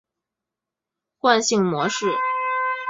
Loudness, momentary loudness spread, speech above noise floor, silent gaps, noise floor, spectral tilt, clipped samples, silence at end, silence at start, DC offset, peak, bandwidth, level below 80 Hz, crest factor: -21 LUFS; 5 LU; 67 dB; none; -86 dBFS; -3.5 dB/octave; under 0.1%; 0 s; 1.25 s; under 0.1%; -2 dBFS; 8 kHz; -70 dBFS; 20 dB